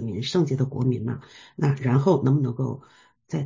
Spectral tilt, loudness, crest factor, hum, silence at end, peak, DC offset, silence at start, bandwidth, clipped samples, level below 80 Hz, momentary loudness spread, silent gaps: -8 dB/octave; -24 LUFS; 16 dB; none; 0 s; -8 dBFS; under 0.1%; 0 s; 7.6 kHz; under 0.1%; -56 dBFS; 13 LU; none